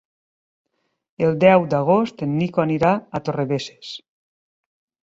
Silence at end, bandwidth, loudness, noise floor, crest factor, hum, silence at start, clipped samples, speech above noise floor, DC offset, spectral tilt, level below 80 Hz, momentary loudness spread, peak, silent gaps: 1.05 s; 7.8 kHz; -19 LUFS; under -90 dBFS; 20 dB; none; 1.2 s; under 0.1%; over 71 dB; under 0.1%; -7.5 dB/octave; -58 dBFS; 17 LU; -2 dBFS; none